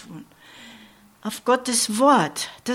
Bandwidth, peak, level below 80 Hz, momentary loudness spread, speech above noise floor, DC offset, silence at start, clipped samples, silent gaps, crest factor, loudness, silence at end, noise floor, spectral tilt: 16.5 kHz; -6 dBFS; -66 dBFS; 20 LU; 29 dB; under 0.1%; 0.1 s; under 0.1%; none; 18 dB; -20 LUFS; 0 s; -50 dBFS; -3 dB/octave